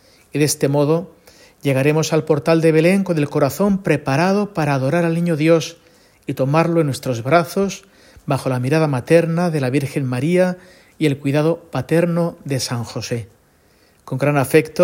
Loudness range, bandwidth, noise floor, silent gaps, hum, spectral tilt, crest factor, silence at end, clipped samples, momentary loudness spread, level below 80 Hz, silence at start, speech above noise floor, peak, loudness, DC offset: 4 LU; 16.5 kHz; -55 dBFS; none; none; -6 dB/octave; 18 dB; 0 s; under 0.1%; 10 LU; -54 dBFS; 0.35 s; 38 dB; 0 dBFS; -18 LUFS; under 0.1%